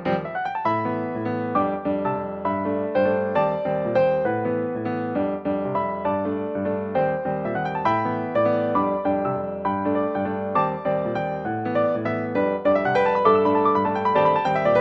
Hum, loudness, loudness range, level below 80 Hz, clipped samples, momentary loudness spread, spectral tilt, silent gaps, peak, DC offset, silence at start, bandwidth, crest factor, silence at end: none; -23 LUFS; 4 LU; -56 dBFS; under 0.1%; 7 LU; -8.5 dB/octave; none; -4 dBFS; under 0.1%; 0 s; 6.4 kHz; 18 dB; 0 s